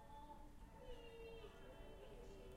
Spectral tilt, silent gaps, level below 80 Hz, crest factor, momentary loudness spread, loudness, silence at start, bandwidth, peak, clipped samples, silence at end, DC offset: -5.5 dB/octave; none; -62 dBFS; 14 dB; 4 LU; -60 LUFS; 0 s; 15.5 kHz; -44 dBFS; under 0.1%; 0 s; under 0.1%